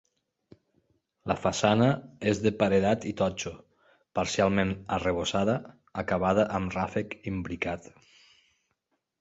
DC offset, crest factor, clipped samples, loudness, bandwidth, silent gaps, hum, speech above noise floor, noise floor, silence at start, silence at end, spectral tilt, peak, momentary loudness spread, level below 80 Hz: under 0.1%; 22 dB; under 0.1%; -28 LUFS; 8 kHz; none; none; 51 dB; -79 dBFS; 1.25 s; 1.4 s; -5.5 dB/octave; -8 dBFS; 11 LU; -52 dBFS